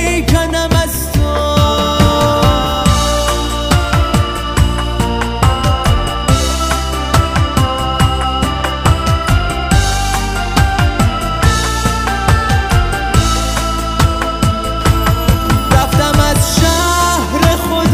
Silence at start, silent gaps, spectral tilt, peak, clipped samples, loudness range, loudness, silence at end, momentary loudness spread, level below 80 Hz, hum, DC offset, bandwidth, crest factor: 0 s; none; -4.5 dB/octave; 0 dBFS; under 0.1%; 2 LU; -13 LUFS; 0 s; 4 LU; -18 dBFS; none; under 0.1%; 16.5 kHz; 12 dB